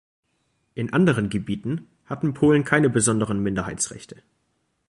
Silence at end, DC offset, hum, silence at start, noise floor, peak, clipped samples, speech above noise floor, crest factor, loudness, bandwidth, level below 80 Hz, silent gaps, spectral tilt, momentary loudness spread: 0.85 s; under 0.1%; none; 0.75 s; -70 dBFS; -4 dBFS; under 0.1%; 48 dB; 20 dB; -22 LUFS; 11.5 kHz; -52 dBFS; none; -5.5 dB/octave; 14 LU